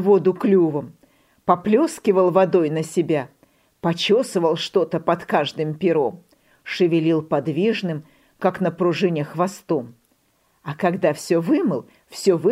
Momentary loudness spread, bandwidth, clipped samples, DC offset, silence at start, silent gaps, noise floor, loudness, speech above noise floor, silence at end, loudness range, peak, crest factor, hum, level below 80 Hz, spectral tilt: 11 LU; 15 kHz; under 0.1%; under 0.1%; 0 s; none; -64 dBFS; -21 LUFS; 44 dB; 0 s; 4 LU; -2 dBFS; 18 dB; none; -66 dBFS; -6 dB/octave